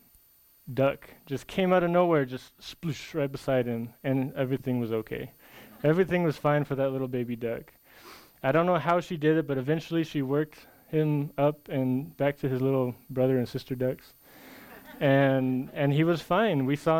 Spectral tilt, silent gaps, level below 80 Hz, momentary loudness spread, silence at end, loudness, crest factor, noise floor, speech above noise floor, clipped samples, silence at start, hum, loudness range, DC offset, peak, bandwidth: -7.5 dB/octave; none; -58 dBFS; 12 LU; 0 s; -28 LUFS; 18 dB; -61 dBFS; 34 dB; under 0.1%; 0.65 s; none; 2 LU; under 0.1%; -10 dBFS; 17 kHz